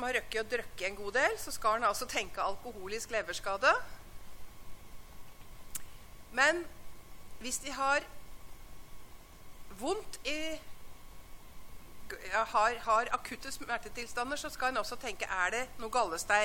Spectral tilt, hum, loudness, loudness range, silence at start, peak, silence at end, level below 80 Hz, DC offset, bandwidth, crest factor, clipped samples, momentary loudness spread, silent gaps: -2 dB/octave; none; -33 LUFS; 8 LU; 0 s; -12 dBFS; 0 s; -54 dBFS; under 0.1%; 17 kHz; 24 dB; under 0.1%; 26 LU; none